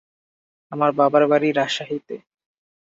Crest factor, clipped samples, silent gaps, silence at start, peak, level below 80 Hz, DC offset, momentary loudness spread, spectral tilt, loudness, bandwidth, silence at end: 18 dB; under 0.1%; none; 0.7 s; -4 dBFS; -72 dBFS; under 0.1%; 19 LU; -5.5 dB/octave; -20 LUFS; 7.8 kHz; 0.8 s